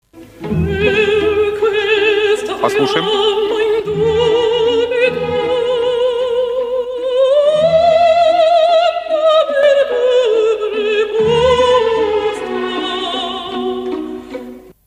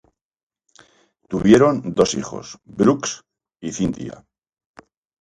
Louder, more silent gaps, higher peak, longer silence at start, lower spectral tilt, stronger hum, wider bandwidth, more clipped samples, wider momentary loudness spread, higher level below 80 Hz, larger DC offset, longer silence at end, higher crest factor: first, -14 LUFS vs -19 LUFS; neither; about the same, 0 dBFS vs 0 dBFS; second, 0.15 s vs 1.3 s; about the same, -5 dB/octave vs -5.5 dB/octave; neither; about the same, 11.5 kHz vs 11 kHz; neither; second, 9 LU vs 21 LU; first, -42 dBFS vs -50 dBFS; neither; second, 0.2 s vs 1.1 s; second, 14 dB vs 20 dB